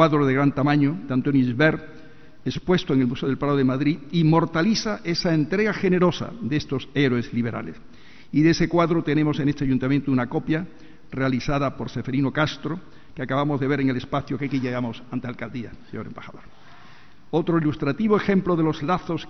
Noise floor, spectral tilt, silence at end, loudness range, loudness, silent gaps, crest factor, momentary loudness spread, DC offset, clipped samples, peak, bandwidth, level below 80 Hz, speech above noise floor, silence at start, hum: -50 dBFS; -7 dB/octave; 0 s; 6 LU; -23 LUFS; none; 20 dB; 13 LU; 0.8%; under 0.1%; -4 dBFS; 6.4 kHz; -48 dBFS; 28 dB; 0 s; none